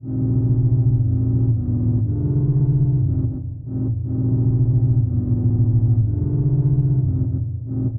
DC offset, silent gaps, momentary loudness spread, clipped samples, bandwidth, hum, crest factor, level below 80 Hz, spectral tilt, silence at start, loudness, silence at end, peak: under 0.1%; none; 6 LU; under 0.1%; 1.4 kHz; none; 10 dB; -34 dBFS; -17 dB/octave; 0.05 s; -19 LUFS; 0 s; -8 dBFS